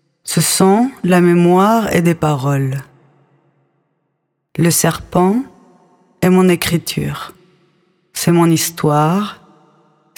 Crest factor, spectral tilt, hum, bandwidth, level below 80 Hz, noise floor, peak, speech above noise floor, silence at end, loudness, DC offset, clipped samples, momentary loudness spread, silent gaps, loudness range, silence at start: 16 dB; -5 dB/octave; none; over 20 kHz; -48 dBFS; -69 dBFS; 0 dBFS; 56 dB; 0.85 s; -14 LUFS; under 0.1%; under 0.1%; 13 LU; none; 5 LU; 0.25 s